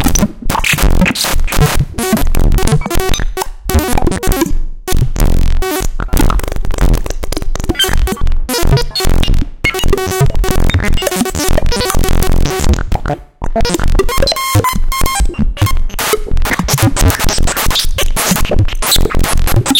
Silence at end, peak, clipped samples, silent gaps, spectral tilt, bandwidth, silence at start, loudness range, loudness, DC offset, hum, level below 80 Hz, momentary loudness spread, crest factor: 0 s; 0 dBFS; under 0.1%; none; -4 dB/octave; 17.5 kHz; 0 s; 3 LU; -14 LUFS; under 0.1%; none; -12 dBFS; 6 LU; 10 dB